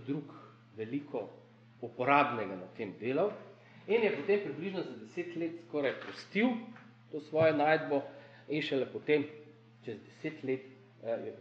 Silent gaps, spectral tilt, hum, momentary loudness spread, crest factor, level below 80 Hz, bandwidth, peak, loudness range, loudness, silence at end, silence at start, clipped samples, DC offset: none; -7 dB/octave; none; 20 LU; 22 dB; -86 dBFS; 7.8 kHz; -12 dBFS; 3 LU; -34 LUFS; 0 s; 0 s; under 0.1%; under 0.1%